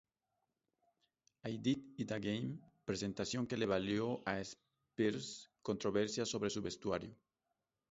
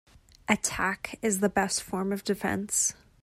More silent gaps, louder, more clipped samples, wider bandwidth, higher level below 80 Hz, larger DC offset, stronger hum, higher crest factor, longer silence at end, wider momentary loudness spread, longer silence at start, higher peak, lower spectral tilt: neither; second, -40 LUFS vs -28 LUFS; neither; second, 7.6 kHz vs 16 kHz; second, -70 dBFS vs -56 dBFS; neither; neither; about the same, 20 dB vs 22 dB; first, 0.8 s vs 0.3 s; first, 11 LU vs 5 LU; first, 1.45 s vs 0.5 s; second, -20 dBFS vs -6 dBFS; first, -5 dB/octave vs -3 dB/octave